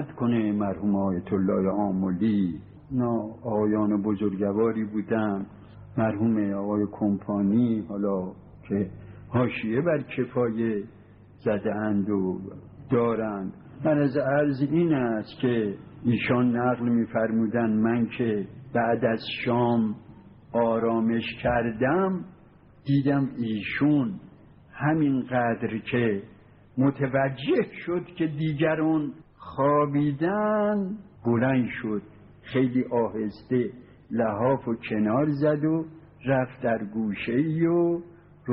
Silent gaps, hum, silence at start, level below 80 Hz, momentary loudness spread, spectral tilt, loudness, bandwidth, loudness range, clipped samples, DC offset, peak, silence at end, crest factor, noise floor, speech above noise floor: none; none; 0 s; -58 dBFS; 9 LU; -7 dB/octave; -26 LUFS; 5 kHz; 3 LU; under 0.1%; under 0.1%; -10 dBFS; 0 s; 14 dB; -53 dBFS; 28 dB